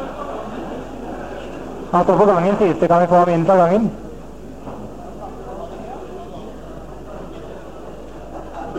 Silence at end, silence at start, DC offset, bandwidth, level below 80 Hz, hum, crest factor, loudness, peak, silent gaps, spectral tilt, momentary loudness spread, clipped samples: 0 s; 0 s; 1%; 11 kHz; -42 dBFS; none; 16 dB; -17 LUFS; -4 dBFS; none; -8 dB/octave; 22 LU; under 0.1%